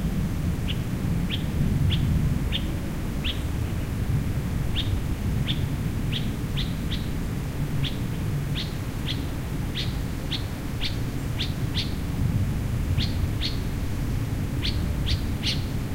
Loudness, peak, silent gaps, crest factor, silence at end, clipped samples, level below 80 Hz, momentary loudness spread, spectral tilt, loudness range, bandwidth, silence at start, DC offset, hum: -28 LUFS; -12 dBFS; none; 14 dB; 0 s; under 0.1%; -32 dBFS; 4 LU; -6 dB/octave; 3 LU; 16 kHz; 0 s; under 0.1%; none